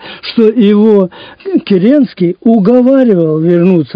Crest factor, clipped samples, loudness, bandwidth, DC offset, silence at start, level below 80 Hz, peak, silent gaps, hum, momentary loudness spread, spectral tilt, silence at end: 8 dB; 2%; -9 LUFS; 5.2 kHz; under 0.1%; 0 s; -56 dBFS; 0 dBFS; none; none; 9 LU; -10 dB/octave; 0 s